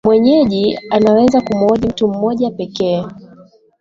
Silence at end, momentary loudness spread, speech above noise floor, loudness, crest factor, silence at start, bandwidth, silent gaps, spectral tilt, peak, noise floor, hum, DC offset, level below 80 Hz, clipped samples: 0.55 s; 9 LU; 31 dB; -14 LUFS; 14 dB; 0.05 s; 7.6 kHz; none; -7 dB/octave; 0 dBFS; -44 dBFS; none; under 0.1%; -46 dBFS; under 0.1%